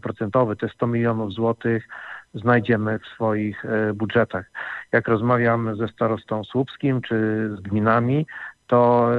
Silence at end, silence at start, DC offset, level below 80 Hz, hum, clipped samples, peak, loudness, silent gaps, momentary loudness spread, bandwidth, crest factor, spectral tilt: 0 s; 0.05 s; under 0.1%; -62 dBFS; none; under 0.1%; -4 dBFS; -22 LUFS; none; 8 LU; 4.9 kHz; 18 dB; -9.5 dB/octave